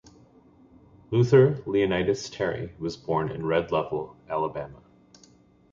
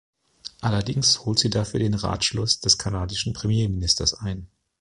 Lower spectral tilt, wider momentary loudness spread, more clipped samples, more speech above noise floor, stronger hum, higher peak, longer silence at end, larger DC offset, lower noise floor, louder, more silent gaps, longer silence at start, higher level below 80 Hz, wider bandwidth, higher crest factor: first, -7 dB/octave vs -3.5 dB/octave; about the same, 14 LU vs 12 LU; neither; first, 32 dB vs 21 dB; neither; second, -6 dBFS vs -2 dBFS; first, 1 s vs 0.35 s; neither; first, -57 dBFS vs -44 dBFS; second, -26 LUFS vs -22 LUFS; neither; first, 1.1 s vs 0.45 s; second, -54 dBFS vs -40 dBFS; second, 7.6 kHz vs 11.5 kHz; about the same, 20 dB vs 22 dB